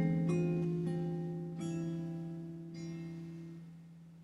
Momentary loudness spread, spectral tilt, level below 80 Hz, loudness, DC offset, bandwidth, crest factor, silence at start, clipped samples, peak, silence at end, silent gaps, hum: 17 LU; -8.5 dB/octave; -68 dBFS; -39 LUFS; under 0.1%; 11.5 kHz; 16 dB; 0 s; under 0.1%; -22 dBFS; 0 s; none; none